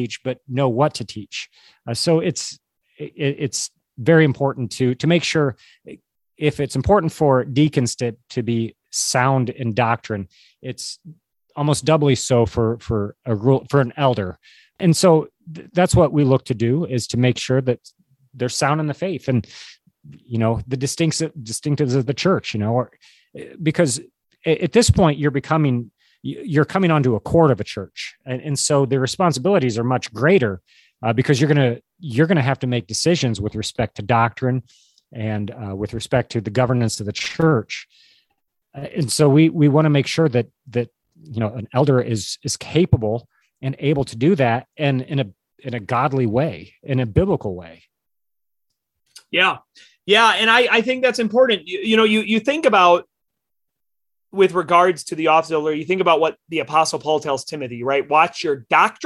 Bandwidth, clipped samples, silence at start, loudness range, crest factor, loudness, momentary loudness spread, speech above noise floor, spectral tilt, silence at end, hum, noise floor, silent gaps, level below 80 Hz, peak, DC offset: 12.5 kHz; under 0.1%; 0 s; 5 LU; 18 dB; -19 LUFS; 14 LU; 66 dB; -5.5 dB/octave; 0 s; none; -84 dBFS; none; -44 dBFS; -2 dBFS; under 0.1%